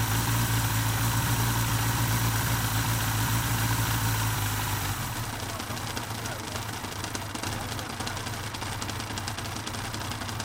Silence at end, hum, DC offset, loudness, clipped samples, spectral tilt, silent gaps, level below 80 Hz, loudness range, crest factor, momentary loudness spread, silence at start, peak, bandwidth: 0 s; none; under 0.1%; -29 LUFS; under 0.1%; -3.5 dB/octave; none; -42 dBFS; 7 LU; 14 dB; 8 LU; 0 s; -14 dBFS; 17 kHz